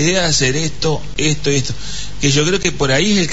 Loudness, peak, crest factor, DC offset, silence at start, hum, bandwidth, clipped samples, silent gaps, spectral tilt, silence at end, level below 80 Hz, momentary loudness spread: -16 LUFS; -2 dBFS; 14 dB; 7%; 0 s; none; 8 kHz; under 0.1%; none; -3.5 dB/octave; 0 s; -34 dBFS; 7 LU